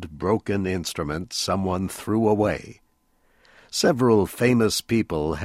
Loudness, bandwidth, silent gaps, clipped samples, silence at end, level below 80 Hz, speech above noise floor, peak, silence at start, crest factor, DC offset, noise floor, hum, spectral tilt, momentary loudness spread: -23 LUFS; 16 kHz; none; under 0.1%; 0 s; -48 dBFS; 42 dB; -4 dBFS; 0 s; 18 dB; under 0.1%; -64 dBFS; none; -5 dB/octave; 8 LU